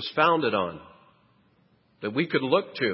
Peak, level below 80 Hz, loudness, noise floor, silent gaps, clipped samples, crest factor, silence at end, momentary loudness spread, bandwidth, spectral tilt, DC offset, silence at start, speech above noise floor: -6 dBFS; -66 dBFS; -25 LUFS; -64 dBFS; none; under 0.1%; 22 dB; 0 s; 13 LU; 5.8 kHz; -9.5 dB/octave; under 0.1%; 0 s; 39 dB